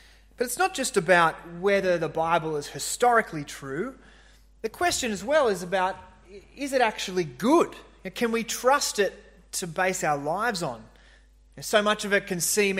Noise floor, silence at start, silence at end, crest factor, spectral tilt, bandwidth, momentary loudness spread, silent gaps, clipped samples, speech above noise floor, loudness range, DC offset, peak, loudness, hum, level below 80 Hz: -55 dBFS; 0.4 s; 0 s; 20 dB; -3 dB/octave; 16 kHz; 13 LU; none; under 0.1%; 30 dB; 3 LU; under 0.1%; -6 dBFS; -25 LUFS; none; -56 dBFS